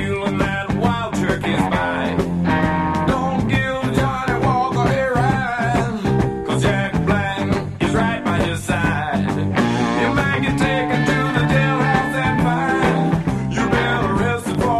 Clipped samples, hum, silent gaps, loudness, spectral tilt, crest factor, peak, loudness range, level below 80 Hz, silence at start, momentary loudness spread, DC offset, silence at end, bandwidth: under 0.1%; none; none; -19 LUFS; -6.5 dB/octave; 16 dB; -2 dBFS; 2 LU; -34 dBFS; 0 s; 3 LU; under 0.1%; 0 s; 13 kHz